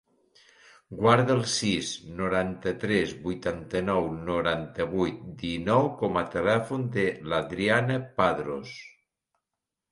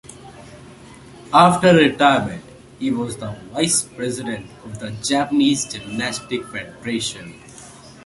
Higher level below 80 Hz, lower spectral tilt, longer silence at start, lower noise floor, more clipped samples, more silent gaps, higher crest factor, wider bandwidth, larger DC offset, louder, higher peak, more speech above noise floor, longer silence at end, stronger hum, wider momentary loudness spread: about the same, -54 dBFS vs -52 dBFS; about the same, -5 dB/octave vs -4 dB/octave; first, 0.9 s vs 0.1 s; first, -87 dBFS vs -42 dBFS; neither; neither; about the same, 22 dB vs 20 dB; about the same, 11.5 kHz vs 11.5 kHz; neither; second, -27 LUFS vs -19 LUFS; second, -6 dBFS vs 0 dBFS; first, 60 dB vs 23 dB; first, 1 s vs 0.15 s; neither; second, 8 LU vs 22 LU